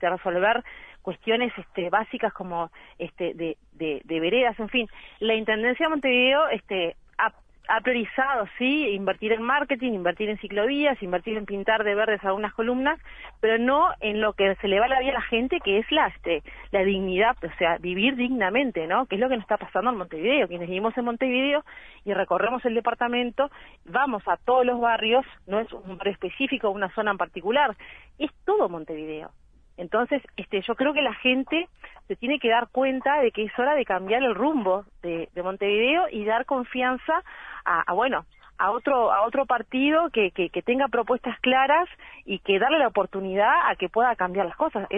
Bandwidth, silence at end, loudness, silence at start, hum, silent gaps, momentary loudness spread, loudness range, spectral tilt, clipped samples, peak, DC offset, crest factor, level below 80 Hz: 3.9 kHz; 0 s; -24 LUFS; 0 s; none; none; 10 LU; 4 LU; -7 dB/octave; under 0.1%; -8 dBFS; under 0.1%; 16 dB; -54 dBFS